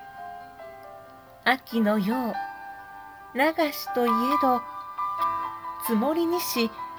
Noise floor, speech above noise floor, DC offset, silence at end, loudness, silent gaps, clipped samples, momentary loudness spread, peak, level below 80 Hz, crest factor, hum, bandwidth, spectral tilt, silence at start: -48 dBFS; 23 dB; under 0.1%; 0 s; -26 LUFS; none; under 0.1%; 20 LU; -8 dBFS; -66 dBFS; 20 dB; none; over 20 kHz; -4.5 dB/octave; 0 s